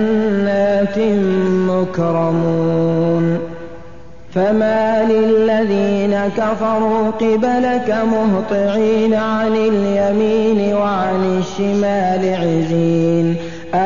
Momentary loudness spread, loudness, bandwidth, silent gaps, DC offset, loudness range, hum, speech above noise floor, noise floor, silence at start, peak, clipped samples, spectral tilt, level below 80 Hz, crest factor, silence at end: 4 LU; -16 LUFS; 7.4 kHz; none; 2%; 2 LU; none; 24 dB; -39 dBFS; 0 s; -4 dBFS; under 0.1%; -7.5 dB/octave; -46 dBFS; 10 dB; 0 s